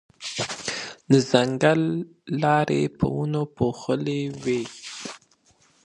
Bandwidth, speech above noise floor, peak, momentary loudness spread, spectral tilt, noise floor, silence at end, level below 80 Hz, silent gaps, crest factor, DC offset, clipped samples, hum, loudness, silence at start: 11.5 kHz; 38 dB; 0 dBFS; 13 LU; -5.5 dB/octave; -61 dBFS; 0.65 s; -54 dBFS; none; 24 dB; under 0.1%; under 0.1%; none; -24 LUFS; 0.2 s